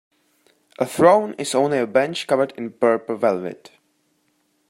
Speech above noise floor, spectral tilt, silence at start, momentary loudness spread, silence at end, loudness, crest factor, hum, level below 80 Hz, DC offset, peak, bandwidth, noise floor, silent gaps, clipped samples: 47 dB; -5 dB/octave; 0.8 s; 11 LU; 1.15 s; -20 LUFS; 20 dB; none; -70 dBFS; under 0.1%; -2 dBFS; 16 kHz; -66 dBFS; none; under 0.1%